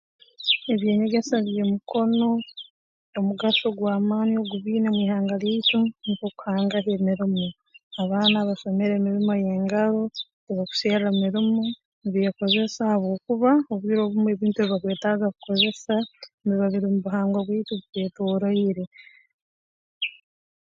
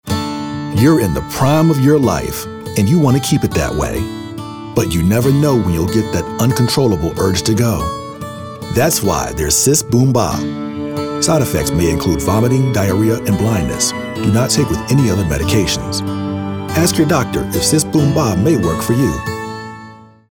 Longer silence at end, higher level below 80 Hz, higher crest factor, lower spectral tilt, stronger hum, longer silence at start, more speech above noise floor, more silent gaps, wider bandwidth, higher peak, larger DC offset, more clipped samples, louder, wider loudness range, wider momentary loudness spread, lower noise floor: first, 0.6 s vs 0.25 s; second, -68 dBFS vs -34 dBFS; about the same, 18 dB vs 14 dB; first, -6.5 dB/octave vs -5 dB/octave; neither; first, 0.4 s vs 0.05 s; first, over 67 dB vs 24 dB; first, 2.70-3.13 s, 7.83-7.91 s, 10.33-10.47 s, 11.85-12.02 s, 16.34-16.38 s, 18.87-18.92 s, 19.33-20.01 s vs none; second, 7.4 kHz vs over 20 kHz; second, -6 dBFS vs 0 dBFS; neither; neither; second, -24 LUFS vs -15 LUFS; about the same, 2 LU vs 2 LU; about the same, 9 LU vs 10 LU; first, under -90 dBFS vs -38 dBFS